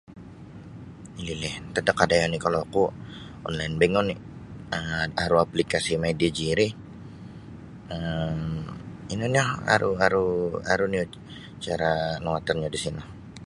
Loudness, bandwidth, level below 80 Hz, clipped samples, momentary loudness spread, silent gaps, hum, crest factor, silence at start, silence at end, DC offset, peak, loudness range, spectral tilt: -26 LUFS; 11.5 kHz; -48 dBFS; under 0.1%; 20 LU; none; none; 26 dB; 0.1 s; 0 s; under 0.1%; 0 dBFS; 3 LU; -5 dB/octave